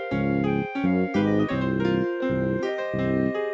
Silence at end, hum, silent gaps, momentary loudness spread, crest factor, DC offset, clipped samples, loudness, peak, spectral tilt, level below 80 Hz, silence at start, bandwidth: 0 s; none; none; 3 LU; 12 dB; under 0.1%; under 0.1%; -25 LUFS; -12 dBFS; -8.5 dB/octave; -46 dBFS; 0 s; 7.4 kHz